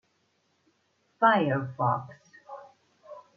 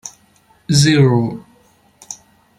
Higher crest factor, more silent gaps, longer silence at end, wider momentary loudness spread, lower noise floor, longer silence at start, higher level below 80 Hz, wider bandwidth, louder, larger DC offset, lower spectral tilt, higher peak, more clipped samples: first, 24 dB vs 16 dB; neither; second, 0.15 s vs 0.45 s; first, 26 LU vs 23 LU; first, -72 dBFS vs -53 dBFS; first, 1.2 s vs 0.05 s; second, -78 dBFS vs -50 dBFS; second, 6.6 kHz vs 12.5 kHz; second, -26 LUFS vs -14 LUFS; neither; first, -8 dB/octave vs -5 dB/octave; second, -8 dBFS vs -2 dBFS; neither